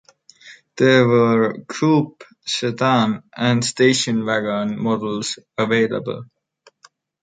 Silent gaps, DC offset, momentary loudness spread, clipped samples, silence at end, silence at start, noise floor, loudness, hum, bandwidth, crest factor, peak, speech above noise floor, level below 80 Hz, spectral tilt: none; under 0.1%; 11 LU; under 0.1%; 1 s; 0.45 s; -56 dBFS; -18 LUFS; none; 9.4 kHz; 18 dB; -2 dBFS; 38 dB; -62 dBFS; -5 dB/octave